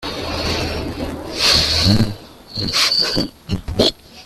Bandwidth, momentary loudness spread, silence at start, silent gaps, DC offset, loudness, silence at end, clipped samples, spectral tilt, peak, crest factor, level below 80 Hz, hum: 15 kHz; 13 LU; 0 s; none; under 0.1%; -17 LUFS; 0 s; under 0.1%; -3.5 dB/octave; 0 dBFS; 18 dB; -34 dBFS; none